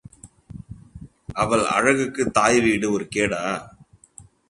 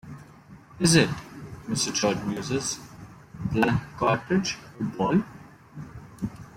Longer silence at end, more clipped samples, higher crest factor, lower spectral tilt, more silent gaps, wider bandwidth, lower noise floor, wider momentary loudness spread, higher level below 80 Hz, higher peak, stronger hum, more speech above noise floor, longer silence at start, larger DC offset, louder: first, 0.65 s vs 0 s; neither; about the same, 22 dB vs 22 dB; about the same, -4 dB/octave vs -4.5 dB/octave; neither; second, 11.5 kHz vs 16.5 kHz; about the same, -49 dBFS vs -49 dBFS; about the same, 24 LU vs 23 LU; about the same, -50 dBFS vs -52 dBFS; first, -2 dBFS vs -6 dBFS; neither; first, 29 dB vs 24 dB; first, 0.25 s vs 0.05 s; neither; first, -21 LUFS vs -26 LUFS